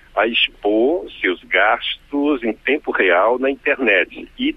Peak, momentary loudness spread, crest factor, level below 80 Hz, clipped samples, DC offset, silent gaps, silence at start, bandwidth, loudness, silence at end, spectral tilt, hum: -2 dBFS; 6 LU; 16 dB; -50 dBFS; under 0.1%; under 0.1%; none; 0.15 s; 5.6 kHz; -17 LUFS; 0 s; -5.5 dB/octave; none